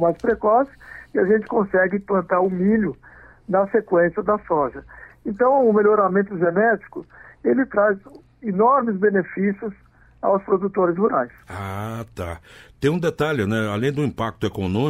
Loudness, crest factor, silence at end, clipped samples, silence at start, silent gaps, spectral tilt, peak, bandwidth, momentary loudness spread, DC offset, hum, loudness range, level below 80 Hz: -21 LUFS; 14 dB; 0 s; under 0.1%; 0 s; none; -7.5 dB/octave; -6 dBFS; 14 kHz; 14 LU; under 0.1%; none; 4 LU; -52 dBFS